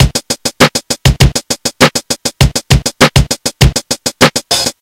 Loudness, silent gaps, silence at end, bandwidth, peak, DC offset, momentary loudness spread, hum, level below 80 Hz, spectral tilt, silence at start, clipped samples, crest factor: -11 LUFS; none; 0.1 s; over 20 kHz; 0 dBFS; under 0.1%; 6 LU; none; -20 dBFS; -3.5 dB/octave; 0 s; 2%; 12 dB